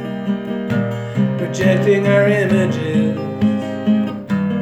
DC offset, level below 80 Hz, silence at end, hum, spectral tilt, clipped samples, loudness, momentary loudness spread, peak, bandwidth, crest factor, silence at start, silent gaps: under 0.1%; -52 dBFS; 0 s; none; -7.5 dB/octave; under 0.1%; -17 LUFS; 8 LU; -2 dBFS; 9 kHz; 14 dB; 0 s; none